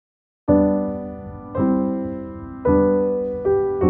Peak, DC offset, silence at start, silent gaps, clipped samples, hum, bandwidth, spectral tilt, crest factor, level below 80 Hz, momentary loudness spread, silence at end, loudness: -4 dBFS; under 0.1%; 0.45 s; none; under 0.1%; none; 2.8 kHz; -14 dB/octave; 16 dB; -44 dBFS; 14 LU; 0 s; -21 LUFS